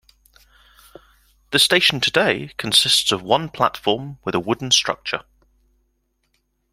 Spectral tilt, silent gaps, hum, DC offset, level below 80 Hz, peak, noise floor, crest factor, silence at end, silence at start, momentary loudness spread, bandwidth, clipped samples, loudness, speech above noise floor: -2 dB/octave; none; none; under 0.1%; -56 dBFS; 0 dBFS; -69 dBFS; 20 dB; 1.5 s; 1.5 s; 11 LU; 16.5 kHz; under 0.1%; -18 LUFS; 49 dB